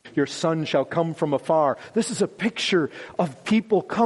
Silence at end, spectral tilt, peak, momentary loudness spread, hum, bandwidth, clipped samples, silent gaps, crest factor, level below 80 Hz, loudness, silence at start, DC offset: 0 s; -5 dB/octave; -8 dBFS; 5 LU; none; 11.5 kHz; under 0.1%; none; 16 dB; -66 dBFS; -24 LUFS; 0.05 s; under 0.1%